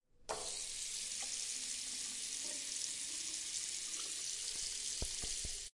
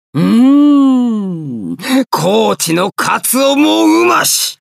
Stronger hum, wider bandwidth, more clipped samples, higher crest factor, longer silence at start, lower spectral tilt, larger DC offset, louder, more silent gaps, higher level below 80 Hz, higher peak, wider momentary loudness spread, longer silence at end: neither; second, 11.5 kHz vs 15.5 kHz; neither; first, 20 dB vs 10 dB; about the same, 0.2 s vs 0.15 s; second, 0.5 dB/octave vs -4 dB/octave; neither; second, -40 LUFS vs -11 LUFS; neither; first, -58 dBFS vs -64 dBFS; second, -22 dBFS vs 0 dBFS; second, 2 LU vs 10 LU; about the same, 0.1 s vs 0.15 s